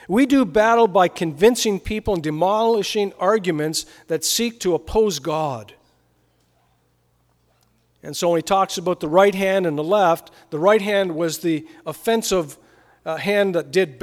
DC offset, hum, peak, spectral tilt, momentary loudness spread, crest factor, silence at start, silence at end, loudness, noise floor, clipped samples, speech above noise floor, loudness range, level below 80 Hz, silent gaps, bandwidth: under 0.1%; none; -2 dBFS; -4 dB/octave; 10 LU; 18 dB; 0.1 s; 0.05 s; -20 LUFS; -63 dBFS; under 0.1%; 44 dB; 8 LU; -48 dBFS; none; 17.5 kHz